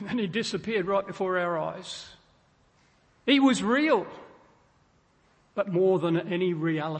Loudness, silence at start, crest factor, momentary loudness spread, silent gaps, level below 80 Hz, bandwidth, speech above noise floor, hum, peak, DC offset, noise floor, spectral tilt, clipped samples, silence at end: -26 LUFS; 0 s; 18 dB; 16 LU; none; -66 dBFS; 8.8 kHz; 38 dB; none; -10 dBFS; under 0.1%; -64 dBFS; -5.5 dB/octave; under 0.1%; 0 s